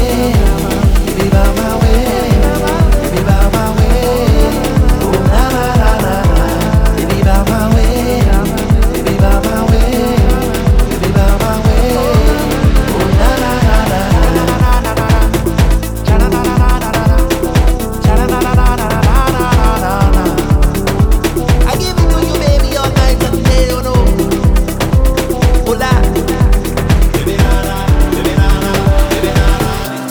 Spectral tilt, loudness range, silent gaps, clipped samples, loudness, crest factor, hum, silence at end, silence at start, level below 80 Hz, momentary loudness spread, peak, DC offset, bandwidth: -6 dB/octave; 1 LU; none; under 0.1%; -12 LUFS; 10 dB; none; 0 s; 0 s; -12 dBFS; 2 LU; 0 dBFS; under 0.1%; over 20 kHz